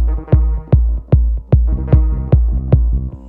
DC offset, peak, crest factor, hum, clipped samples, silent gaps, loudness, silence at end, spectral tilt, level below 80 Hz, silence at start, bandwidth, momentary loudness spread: under 0.1%; 0 dBFS; 12 dB; none; under 0.1%; none; -15 LUFS; 0 s; -13 dB/octave; -14 dBFS; 0 s; 2.8 kHz; 1 LU